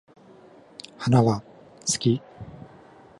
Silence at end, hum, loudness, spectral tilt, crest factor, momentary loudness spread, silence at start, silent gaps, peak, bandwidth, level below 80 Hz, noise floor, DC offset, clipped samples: 0.55 s; none; -24 LUFS; -5.5 dB/octave; 22 dB; 23 LU; 1 s; none; -6 dBFS; 11.5 kHz; -58 dBFS; -51 dBFS; under 0.1%; under 0.1%